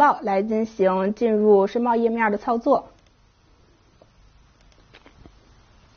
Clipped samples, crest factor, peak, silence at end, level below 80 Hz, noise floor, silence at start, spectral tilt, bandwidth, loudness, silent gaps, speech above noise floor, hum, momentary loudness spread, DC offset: under 0.1%; 18 dB; -6 dBFS; 3.1 s; -58 dBFS; -57 dBFS; 0 s; -5.5 dB/octave; 6.6 kHz; -21 LUFS; none; 37 dB; none; 6 LU; under 0.1%